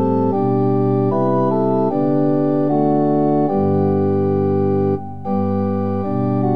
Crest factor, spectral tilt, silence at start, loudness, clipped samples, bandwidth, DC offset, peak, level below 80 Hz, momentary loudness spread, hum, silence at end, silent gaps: 12 dB; -12 dB/octave; 0 s; -17 LUFS; under 0.1%; 5 kHz; 2%; -4 dBFS; -64 dBFS; 4 LU; none; 0 s; none